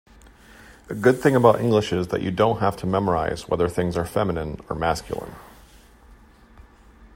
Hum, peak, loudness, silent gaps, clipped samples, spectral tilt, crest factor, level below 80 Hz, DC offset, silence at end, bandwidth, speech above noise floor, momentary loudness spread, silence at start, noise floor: none; 0 dBFS; -22 LUFS; none; under 0.1%; -6.5 dB/octave; 22 dB; -46 dBFS; under 0.1%; 0.1 s; 16 kHz; 28 dB; 13 LU; 0.7 s; -50 dBFS